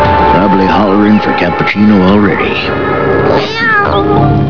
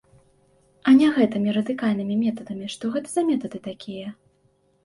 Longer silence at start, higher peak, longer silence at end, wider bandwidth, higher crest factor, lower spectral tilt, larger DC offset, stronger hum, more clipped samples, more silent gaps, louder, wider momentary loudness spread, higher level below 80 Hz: second, 0 s vs 0.85 s; first, 0 dBFS vs -6 dBFS; second, 0 s vs 0.7 s; second, 5.4 kHz vs 11.5 kHz; second, 8 dB vs 18 dB; first, -8 dB/octave vs -6 dB/octave; first, 4% vs under 0.1%; neither; first, 0.9% vs under 0.1%; neither; first, -9 LUFS vs -22 LUFS; second, 4 LU vs 18 LU; first, -28 dBFS vs -66 dBFS